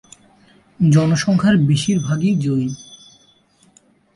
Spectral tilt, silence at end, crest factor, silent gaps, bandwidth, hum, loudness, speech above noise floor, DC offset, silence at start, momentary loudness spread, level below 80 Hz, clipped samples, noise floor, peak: -6.5 dB/octave; 1.2 s; 14 dB; none; 11.5 kHz; none; -17 LUFS; 40 dB; under 0.1%; 0.8 s; 7 LU; -52 dBFS; under 0.1%; -55 dBFS; -4 dBFS